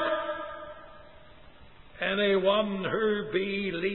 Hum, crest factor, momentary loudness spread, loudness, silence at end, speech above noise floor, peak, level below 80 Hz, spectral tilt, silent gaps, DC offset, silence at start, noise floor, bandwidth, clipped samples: none; 16 dB; 16 LU; -28 LUFS; 0 s; 26 dB; -14 dBFS; -60 dBFS; -9 dB/octave; none; 0.2%; 0 s; -53 dBFS; 4.2 kHz; under 0.1%